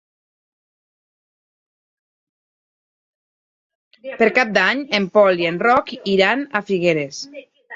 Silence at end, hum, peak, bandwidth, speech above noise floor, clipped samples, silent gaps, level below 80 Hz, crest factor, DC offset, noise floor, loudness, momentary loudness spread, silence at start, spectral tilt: 0 s; none; -2 dBFS; 7.8 kHz; over 72 dB; under 0.1%; none; -62 dBFS; 20 dB; under 0.1%; under -90 dBFS; -17 LUFS; 15 LU; 4.05 s; -5 dB/octave